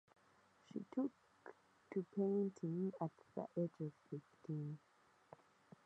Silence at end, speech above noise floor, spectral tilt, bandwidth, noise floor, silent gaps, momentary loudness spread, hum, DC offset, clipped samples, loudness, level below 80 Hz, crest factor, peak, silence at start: 1.1 s; 29 dB; -9.5 dB/octave; 8.4 kHz; -73 dBFS; none; 22 LU; none; under 0.1%; under 0.1%; -45 LUFS; under -90 dBFS; 18 dB; -28 dBFS; 0.75 s